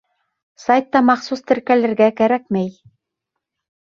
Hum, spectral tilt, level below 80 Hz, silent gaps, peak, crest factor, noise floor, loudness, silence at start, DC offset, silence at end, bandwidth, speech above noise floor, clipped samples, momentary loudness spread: none; -6.5 dB/octave; -62 dBFS; none; -2 dBFS; 18 dB; -80 dBFS; -17 LUFS; 0.6 s; under 0.1%; 1.15 s; 7.2 kHz; 64 dB; under 0.1%; 8 LU